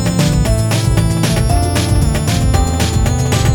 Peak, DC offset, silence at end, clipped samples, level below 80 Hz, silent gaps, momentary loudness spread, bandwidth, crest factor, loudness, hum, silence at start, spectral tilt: 0 dBFS; under 0.1%; 0 s; under 0.1%; -20 dBFS; none; 1 LU; 19 kHz; 12 dB; -14 LUFS; none; 0 s; -5.5 dB/octave